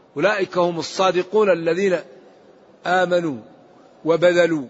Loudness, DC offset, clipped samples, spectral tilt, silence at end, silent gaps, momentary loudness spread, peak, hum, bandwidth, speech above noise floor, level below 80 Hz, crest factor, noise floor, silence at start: -19 LUFS; under 0.1%; under 0.1%; -5 dB/octave; 0 s; none; 11 LU; -4 dBFS; none; 8 kHz; 31 dB; -68 dBFS; 16 dB; -49 dBFS; 0.15 s